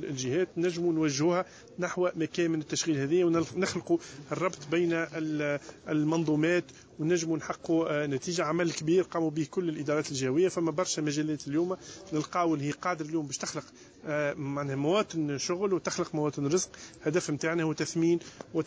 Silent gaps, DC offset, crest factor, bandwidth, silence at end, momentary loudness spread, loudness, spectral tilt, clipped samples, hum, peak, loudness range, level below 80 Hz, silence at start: none; under 0.1%; 14 dB; 8 kHz; 0 s; 7 LU; -30 LUFS; -5 dB/octave; under 0.1%; none; -16 dBFS; 2 LU; -66 dBFS; 0 s